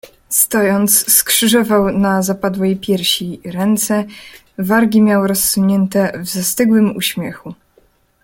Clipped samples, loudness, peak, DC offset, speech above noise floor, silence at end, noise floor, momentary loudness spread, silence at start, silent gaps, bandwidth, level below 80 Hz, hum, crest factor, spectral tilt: under 0.1%; -14 LUFS; 0 dBFS; under 0.1%; 40 dB; 0.7 s; -54 dBFS; 9 LU; 0.3 s; none; 17 kHz; -48 dBFS; none; 14 dB; -3.5 dB/octave